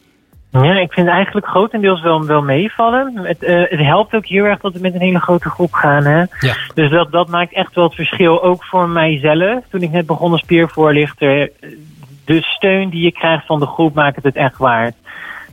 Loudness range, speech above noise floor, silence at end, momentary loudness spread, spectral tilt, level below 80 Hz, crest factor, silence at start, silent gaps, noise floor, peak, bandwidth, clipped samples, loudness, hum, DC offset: 2 LU; 34 dB; 0.1 s; 5 LU; -7.5 dB/octave; -48 dBFS; 12 dB; 0.55 s; none; -47 dBFS; 0 dBFS; 15 kHz; under 0.1%; -13 LUFS; none; under 0.1%